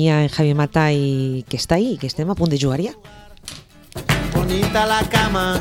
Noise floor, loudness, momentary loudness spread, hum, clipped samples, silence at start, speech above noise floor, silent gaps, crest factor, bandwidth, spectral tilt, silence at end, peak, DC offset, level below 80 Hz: -38 dBFS; -19 LUFS; 19 LU; none; under 0.1%; 0 s; 20 dB; none; 18 dB; 16.5 kHz; -5.5 dB/octave; 0 s; -2 dBFS; under 0.1%; -36 dBFS